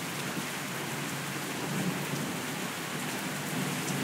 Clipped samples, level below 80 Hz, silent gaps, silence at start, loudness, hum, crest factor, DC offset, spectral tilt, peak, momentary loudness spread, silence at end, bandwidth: under 0.1%; -72 dBFS; none; 0 s; -33 LUFS; none; 16 dB; under 0.1%; -3.5 dB/octave; -18 dBFS; 2 LU; 0 s; 16 kHz